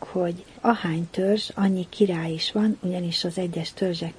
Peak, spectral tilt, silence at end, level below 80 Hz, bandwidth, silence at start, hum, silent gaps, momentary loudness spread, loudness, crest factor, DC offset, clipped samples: -6 dBFS; -6 dB/octave; 0 s; -60 dBFS; 10.5 kHz; 0 s; none; none; 4 LU; -25 LUFS; 20 dB; under 0.1%; under 0.1%